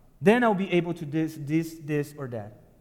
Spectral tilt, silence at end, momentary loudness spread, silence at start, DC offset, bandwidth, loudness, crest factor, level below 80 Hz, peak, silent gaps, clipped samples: -7 dB/octave; 0.25 s; 15 LU; 0.2 s; under 0.1%; 17 kHz; -26 LUFS; 20 dB; -60 dBFS; -6 dBFS; none; under 0.1%